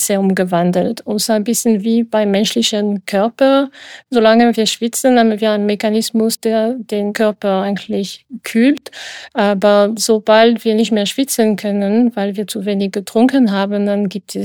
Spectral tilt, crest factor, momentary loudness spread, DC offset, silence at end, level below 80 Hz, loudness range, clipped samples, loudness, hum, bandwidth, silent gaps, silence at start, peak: -4.5 dB/octave; 14 dB; 8 LU; under 0.1%; 0 s; -64 dBFS; 3 LU; under 0.1%; -15 LUFS; none; 19.5 kHz; none; 0 s; 0 dBFS